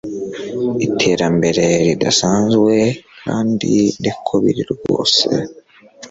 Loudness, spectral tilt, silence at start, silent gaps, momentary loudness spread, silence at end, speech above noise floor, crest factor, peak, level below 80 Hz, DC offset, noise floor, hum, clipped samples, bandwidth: -16 LUFS; -4.5 dB/octave; 0.05 s; none; 10 LU; 0.05 s; 25 dB; 16 dB; 0 dBFS; -50 dBFS; under 0.1%; -41 dBFS; none; under 0.1%; 8.2 kHz